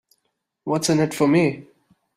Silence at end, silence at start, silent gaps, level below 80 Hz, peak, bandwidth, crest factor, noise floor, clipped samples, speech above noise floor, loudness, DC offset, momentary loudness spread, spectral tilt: 0.55 s; 0.65 s; none; -60 dBFS; -6 dBFS; 15.5 kHz; 16 dB; -75 dBFS; under 0.1%; 56 dB; -20 LUFS; under 0.1%; 16 LU; -5.5 dB/octave